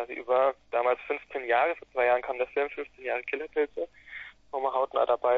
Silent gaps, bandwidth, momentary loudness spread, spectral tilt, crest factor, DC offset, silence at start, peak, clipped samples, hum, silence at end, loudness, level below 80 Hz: none; 5.2 kHz; 12 LU; -5.5 dB/octave; 18 dB; under 0.1%; 0 s; -12 dBFS; under 0.1%; none; 0 s; -29 LUFS; -66 dBFS